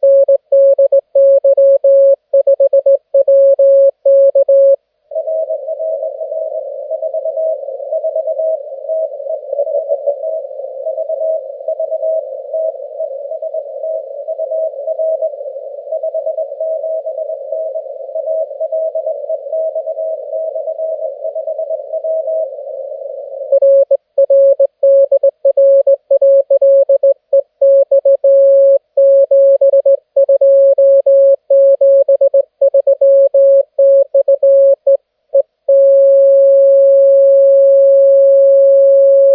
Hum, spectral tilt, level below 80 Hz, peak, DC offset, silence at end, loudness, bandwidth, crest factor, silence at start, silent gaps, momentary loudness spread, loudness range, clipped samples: none; -8 dB/octave; -82 dBFS; -2 dBFS; under 0.1%; 0 s; -11 LUFS; 1.2 kHz; 10 dB; 0 s; none; 14 LU; 11 LU; under 0.1%